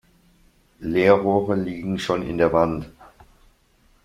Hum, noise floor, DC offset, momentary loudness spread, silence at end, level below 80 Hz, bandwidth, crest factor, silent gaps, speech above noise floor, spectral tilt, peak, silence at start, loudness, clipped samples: none; -59 dBFS; under 0.1%; 14 LU; 1 s; -48 dBFS; 13.5 kHz; 22 dB; none; 39 dB; -7 dB/octave; -2 dBFS; 0.8 s; -21 LUFS; under 0.1%